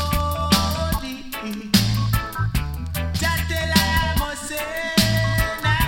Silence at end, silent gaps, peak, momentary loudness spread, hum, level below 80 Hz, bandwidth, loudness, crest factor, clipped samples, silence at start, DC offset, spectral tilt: 0 s; none; -2 dBFS; 9 LU; none; -30 dBFS; 17.5 kHz; -21 LUFS; 18 dB; under 0.1%; 0 s; under 0.1%; -4.5 dB/octave